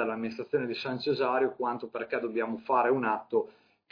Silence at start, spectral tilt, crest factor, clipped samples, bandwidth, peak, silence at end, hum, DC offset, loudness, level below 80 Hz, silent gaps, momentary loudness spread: 0 s; -7 dB/octave; 16 dB; under 0.1%; 5.2 kHz; -14 dBFS; 0.4 s; none; under 0.1%; -30 LUFS; -76 dBFS; none; 7 LU